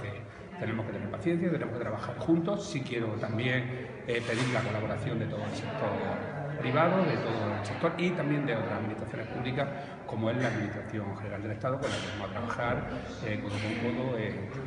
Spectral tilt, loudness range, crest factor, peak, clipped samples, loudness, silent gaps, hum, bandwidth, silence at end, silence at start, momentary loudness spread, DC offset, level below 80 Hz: -6.5 dB/octave; 4 LU; 18 dB; -12 dBFS; under 0.1%; -32 LUFS; none; none; 10.5 kHz; 0 s; 0 s; 8 LU; under 0.1%; -56 dBFS